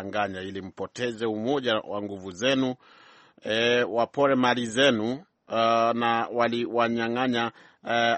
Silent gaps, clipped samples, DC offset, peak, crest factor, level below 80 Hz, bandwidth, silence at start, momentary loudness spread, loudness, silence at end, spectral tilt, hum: none; under 0.1%; under 0.1%; -6 dBFS; 20 dB; -68 dBFS; 8.4 kHz; 0 s; 14 LU; -25 LUFS; 0 s; -4.5 dB/octave; none